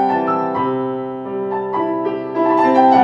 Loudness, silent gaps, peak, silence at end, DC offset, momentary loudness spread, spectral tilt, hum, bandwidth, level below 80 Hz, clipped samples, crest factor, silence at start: -18 LUFS; none; 0 dBFS; 0 s; under 0.1%; 11 LU; -8 dB/octave; none; 7.6 kHz; -60 dBFS; under 0.1%; 16 dB; 0 s